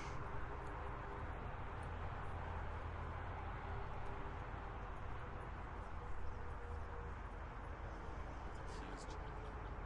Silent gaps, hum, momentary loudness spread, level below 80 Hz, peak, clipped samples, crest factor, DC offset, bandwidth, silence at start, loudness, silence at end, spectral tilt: none; none; 3 LU; -52 dBFS; -34 dBFS; under 0.1%; 14 dB; under 0.1%; 10.5 kHz; 0 s; -49 LUFS; 0 s; -6.5 dB/octave